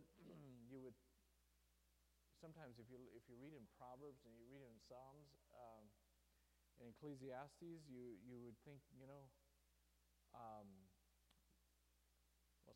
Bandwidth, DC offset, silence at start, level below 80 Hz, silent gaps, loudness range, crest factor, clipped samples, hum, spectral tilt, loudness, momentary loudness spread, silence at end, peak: 15.5 kHz; under 0.1%; 0 s; -82 dBFS; none; 6 LU; 20 dB; under 0.1%; none; -6.5 dB/octave; -62 LUFS; 9 LU; 0 s; -42 dBFS